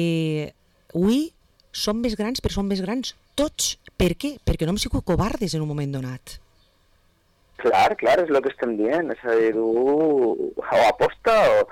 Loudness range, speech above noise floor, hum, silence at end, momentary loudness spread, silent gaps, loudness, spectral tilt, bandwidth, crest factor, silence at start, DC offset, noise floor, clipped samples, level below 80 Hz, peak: 5 LU; 40 dB; none; 0 s; 10 LU; none; -22 LUFS; -5 dB/octave; 17.5 kHz; 10 dB; 0 s; under 0.1%; -61 dBFS; under 0.1%; -38 dBFS; -12 dBFS